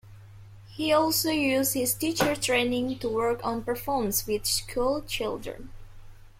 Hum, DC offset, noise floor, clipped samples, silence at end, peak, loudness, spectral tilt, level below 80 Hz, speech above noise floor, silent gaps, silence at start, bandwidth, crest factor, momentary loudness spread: none; under 0.1%; -47 dBFS; under 0.1%; 0.1 s; -10 dBFS; -26 LUFS; -3 dB/octave; -48 dBFS; 20 dB; none; 0.05 s; 16.5 kHz; 18 dB; 8 LU